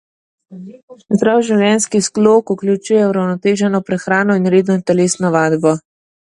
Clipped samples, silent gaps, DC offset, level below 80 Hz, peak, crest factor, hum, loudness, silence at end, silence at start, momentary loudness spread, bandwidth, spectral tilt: under 0.1%; 0.83-0.88 s; under 0.1%; -58 dBFS; 0 dBFS; 14 dB; none; -14 LUFS; 0.5 s; 0.5 s; 5 LU; 11.5 kHz; -5.5 dB/octave